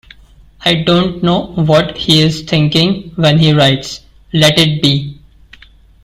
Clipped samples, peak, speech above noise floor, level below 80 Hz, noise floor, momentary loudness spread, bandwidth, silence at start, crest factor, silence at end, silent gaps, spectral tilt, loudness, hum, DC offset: under 0.1%; 0 dBFS; 30 dB; -38 dBFS; -42 dBFS; 9 LU; 15 kHz; 0.6 s; 12 dB; 0.9 s; none; -5.5 dB/octave; -11 LUFS; none; under 0.1%